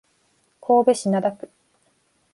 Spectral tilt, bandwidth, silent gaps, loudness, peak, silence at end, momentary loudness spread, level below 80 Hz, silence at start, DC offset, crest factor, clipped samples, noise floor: -6 dB/octave; 11.5 kHz; none; -20 LUFS; -4 dBFS; 1 s; 23 LU; -72 dBFS; 0.7 s; under 0.1%; 18 dB; under 0.1%; -65 dBFS